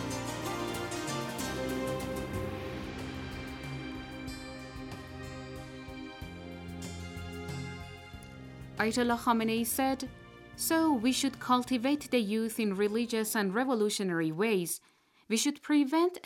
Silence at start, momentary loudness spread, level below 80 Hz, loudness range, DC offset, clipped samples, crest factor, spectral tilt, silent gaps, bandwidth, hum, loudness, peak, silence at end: 0 s; 16 LU; -56 dBFS; 13 LU; under 0.1%; under 0.1%; 20 dB; -4 dB/octave; none; 17 kHz; none; -32 LUFS; -14 dBFS; 0.05 s